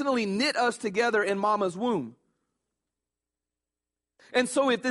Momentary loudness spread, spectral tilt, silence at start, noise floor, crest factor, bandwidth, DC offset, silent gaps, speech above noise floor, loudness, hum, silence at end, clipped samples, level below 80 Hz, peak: 5 LU; -4 dB/octave; 0 s; -89 dBFS; 18 dB; 11.5 kHz; under 0.1%; none; 63 dB; -27 LUFS; 60 Hz at -65 dBFS; 0 s; under 0.1%; -74 dBFS; -10 dBFS